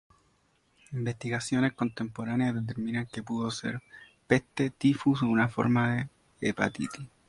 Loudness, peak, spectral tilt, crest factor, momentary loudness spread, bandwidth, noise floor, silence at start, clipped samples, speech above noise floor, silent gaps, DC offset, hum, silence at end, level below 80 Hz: -30 LUFS; -8 dBFS; -6 dB/octave; 22 dB; 10 LU; 11.5 kHz; -69 dBFS; 0.9 s; under 0.1%; 40 dB; none; under 0.1%; none; 0.2 s; -62 dBFS